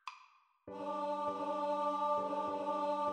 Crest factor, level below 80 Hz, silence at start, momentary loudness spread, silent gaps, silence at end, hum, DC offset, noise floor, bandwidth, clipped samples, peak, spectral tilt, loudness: 12 dB; -80 dBFS; 0.05 s; 9 LU; none; 0 s; none; under 0.1%; -66 dBFS; 9.4 kHz; under 0.1%; -24 dBFS; -5.5 dB/octave; -37 LUFS